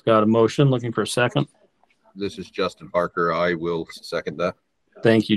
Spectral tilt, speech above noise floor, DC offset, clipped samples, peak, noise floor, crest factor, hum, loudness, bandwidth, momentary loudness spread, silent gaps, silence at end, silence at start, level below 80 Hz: -6 dB/octave; 40 dB; under 0.1%; under 0.1%; -4 dBFS; -61 dBFS; 18 dB; none; -22 LUFS; 12.5 kHz; 12 LU; none; 0 s; 0.05 s; -62 dBFS